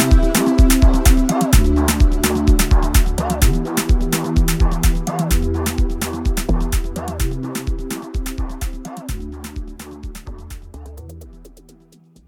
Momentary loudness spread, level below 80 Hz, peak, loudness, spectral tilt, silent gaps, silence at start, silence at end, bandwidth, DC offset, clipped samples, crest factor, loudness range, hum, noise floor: 19 LU; -18 dBFS; 0 dBFS; -18 LUFS; -5 dB/octave; none; 0 s; 0.8 s; 17.5 kHz; under 0.1%; under 0.1%; 16 dB; 16 LU; none; -49 dBFS